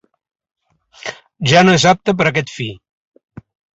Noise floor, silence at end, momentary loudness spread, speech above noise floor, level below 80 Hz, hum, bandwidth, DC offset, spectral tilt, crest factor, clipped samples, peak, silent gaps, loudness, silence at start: -39 dBFS; 1 s; 19 LU; 26 dB; -52 dBFS; none; 8.2 kHz; under 0.1%; -4.5 dB/octave; 18 dB; under 0.1%; 0 dBFS; none; -13 LUFS; 1.05 s